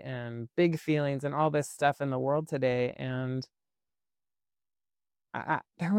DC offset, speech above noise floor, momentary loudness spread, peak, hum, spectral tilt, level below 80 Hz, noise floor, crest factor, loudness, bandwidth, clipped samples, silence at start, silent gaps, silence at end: under 0.1%; over 60 dB; 10 LU; -12 dBFS; none; -6.5 dB/octave; -70 dBFS; under -90 dBFS; 18 dB; -31 LUFS; 16 kHz; under 0.1%; 0 s; none; 0 s